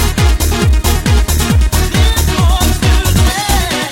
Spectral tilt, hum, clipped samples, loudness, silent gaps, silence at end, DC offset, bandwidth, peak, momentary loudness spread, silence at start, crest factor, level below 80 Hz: -4.5 dB/octave; none; under 0.1%; -12 LUFS; none; 0 s; 0.4%; 17 kHz; -2 dBFS; 1 LU; 0 s; 10 dB; -12 dBFS